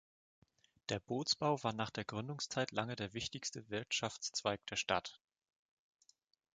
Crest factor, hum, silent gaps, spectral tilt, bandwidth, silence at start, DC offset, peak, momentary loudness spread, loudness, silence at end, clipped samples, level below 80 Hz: 24 dB; none; none; -3.5 dB/octave; 9.6 kHz; 0.9 s; under 0.1%; -16 dBFS; 8 LU; -39 LUFS; 1.4 s; under 0.1%; -70 dBFS